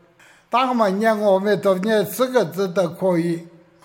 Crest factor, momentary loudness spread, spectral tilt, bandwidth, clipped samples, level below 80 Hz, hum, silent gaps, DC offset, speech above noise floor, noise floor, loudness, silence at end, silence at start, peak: 16 dB; 4 LU; -6 dB/octave; 17 kHz; under 0.1%; -70 dBFS; none; none; under 0.1%; 33 dB; -52 dBFS; -20 LUFS; 0.35 s; 0.5 s; -4 dBFS